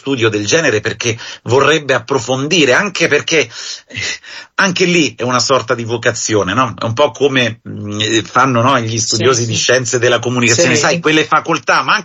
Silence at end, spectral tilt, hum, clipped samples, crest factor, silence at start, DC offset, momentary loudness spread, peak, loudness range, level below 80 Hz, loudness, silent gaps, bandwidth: 0 s; -3.5 dB/octave; none; under 0.1%; 14 dB; 0.05 s; under 0.1%; 8 LU; 0 dBFS; 3 LU; -50 dBFS; -13 LUFS; none; 8.6 kHz